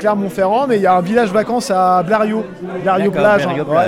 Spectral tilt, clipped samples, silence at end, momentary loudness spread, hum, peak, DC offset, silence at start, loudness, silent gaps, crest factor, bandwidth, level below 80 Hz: -6 dB/octave; under 0.1%; 0 s; 5 LU; none; -2 dBFS; under 0.1%; 0 s; -15 LUFS; none; 12 dB; 15.5 kHz; -50 dBFS